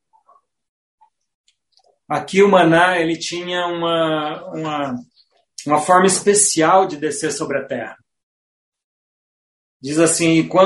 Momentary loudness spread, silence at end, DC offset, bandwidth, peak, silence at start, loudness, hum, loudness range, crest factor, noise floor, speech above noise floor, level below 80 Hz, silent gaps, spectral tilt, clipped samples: 14 LU; 0 s; under 0.1%; 11.5 kHz; 0 dBFS; 2.1 s; -17 LUFS; none; 5 LU; 18 dB; -60 dBFS; 44 dB; -62 dBFS; 8.23-8.72 s, 8.84-9.80 s; -3.5 dB/octave; under 0.1%